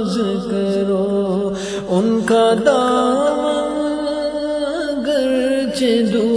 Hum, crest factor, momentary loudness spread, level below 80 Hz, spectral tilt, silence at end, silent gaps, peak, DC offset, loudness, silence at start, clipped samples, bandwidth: none; 16 dB; 7 LU; -48 dBFS; -5.5 dB/octave; 0 s; none; 0 dBFS; under 0.1%; -17 LUFS; 0 s; under 0.1%; 11 kHz